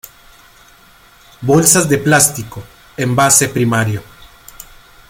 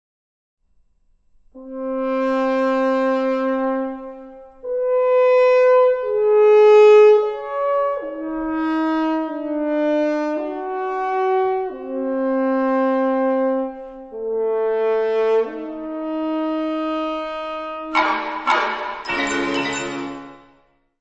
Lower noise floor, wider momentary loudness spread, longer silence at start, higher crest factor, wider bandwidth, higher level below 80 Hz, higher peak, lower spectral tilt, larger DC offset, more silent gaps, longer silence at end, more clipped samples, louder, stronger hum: second, -45 dBFS vs -59 dBFS; first, 18 LU vs 14 LU; second, 1.4 s vs 1.55 s; about the same, 16 dB vs 16 dB; first, 19.5 kHz vs 7.8 kHz; first, -46 dBFS vs -54 dBFS; first, 0 dBFS vs -4 dBFS; about the same, -3.5 dB/octave vs -4 dB/octave; neither; neither; second, 0.45 s vs 0.65 s; neither; first, -12 LUFS vs -19 LUFS; neither